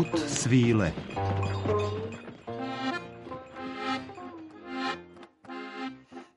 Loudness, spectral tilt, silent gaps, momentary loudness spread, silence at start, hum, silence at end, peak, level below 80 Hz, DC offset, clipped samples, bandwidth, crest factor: -31 LUFS; -5.5 dB/octave; none; 18 LU; 0 s; none; 0.1 s; -12 dBFS; -56 dBFS; under 0.1%; under 0.1%; 11.5 kHz; 20 dB